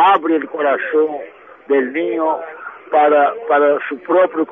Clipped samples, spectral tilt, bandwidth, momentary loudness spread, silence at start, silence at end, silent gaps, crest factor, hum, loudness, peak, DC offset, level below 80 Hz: under 0.1%; -7 dB/octave; 3.8 kHz; 11 LU; 0 s; 0 s; none; 14 dB; none; -16 LUFS; -2 dBFS; under 0.1%; -72 dBFS